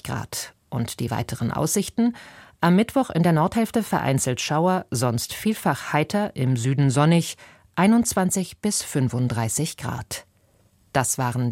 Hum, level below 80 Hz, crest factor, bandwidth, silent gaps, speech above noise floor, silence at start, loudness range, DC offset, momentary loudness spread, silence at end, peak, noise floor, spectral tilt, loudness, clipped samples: none; -52 dBFS; 18 dB; 16.5 kHz; none; 38 dB; 0.05 s; 3 LU; under 0.1%; 11 LU; 0 s; -4 dBFS; -60 dBFS; -5 dB/octave; -23 LUFS; under 0.1%